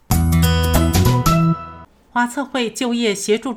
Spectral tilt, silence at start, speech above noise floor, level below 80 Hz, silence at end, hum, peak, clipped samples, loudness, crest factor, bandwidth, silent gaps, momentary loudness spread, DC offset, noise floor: -5.5 dB/octave; 0.1 s; 19 dB; -26 dBFS; 0 s; none; -2 dBFS; under 0.1%; -17 LUFS; 16 dB; 16.5 kHz; none; 7 LU; under 0.1%; -39 dBFS